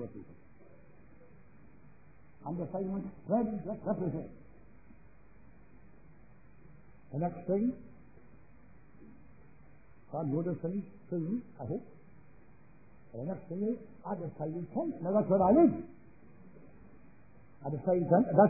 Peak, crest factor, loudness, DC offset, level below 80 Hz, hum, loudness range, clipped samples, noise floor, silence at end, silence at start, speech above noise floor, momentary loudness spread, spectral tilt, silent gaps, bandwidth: -10 dBFS; 24 dB; -33 LUFS; 0.2%; -64 dBFS; none; 10 LU; under 0.1%; -61 dBFS; 0 s; 0 s; 29 dB; 17 LU; -7 dB/octave; none; 2.6 kHz